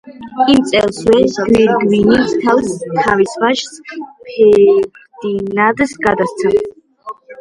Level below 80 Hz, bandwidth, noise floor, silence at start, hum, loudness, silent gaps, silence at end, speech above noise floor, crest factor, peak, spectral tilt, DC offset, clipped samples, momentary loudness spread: -44 dBFS; 11.5 kHz; -33 dBFS; 0.05 s; none; -13 LUFS; none; 0.05 s; 20 dB; 14 dB; 0 dBFS; -5 dB/octave; under 0.1%; under 0.1%; 17 LU